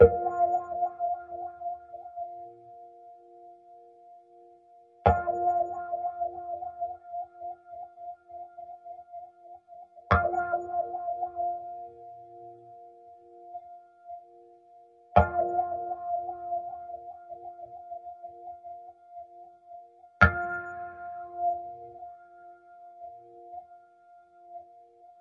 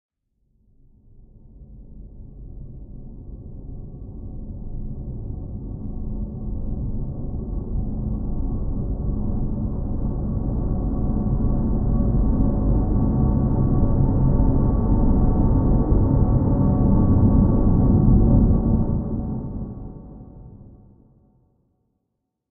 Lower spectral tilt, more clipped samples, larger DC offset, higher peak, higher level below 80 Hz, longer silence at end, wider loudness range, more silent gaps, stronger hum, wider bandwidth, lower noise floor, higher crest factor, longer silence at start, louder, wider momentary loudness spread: second, -8.5 dB/octave vs -16 dB/octave; neither; neither; about the same, -2 dBFS vs -2 dBFS; second, -50 dBFS vs -24 dBFS; second, 0.1 s vs 1.85 s; second, 14 LU vs 19 LU; neither; neither; first, 7.2 kHz vs 1.9 kHz; second, -57 dBFS vs -78 dBFS; first, 30 dB vs 18 dB; second, 0 s vs 1.55 s; second, -30 LUFS vs -22 LUFS; first, 25 LU vs 21 LU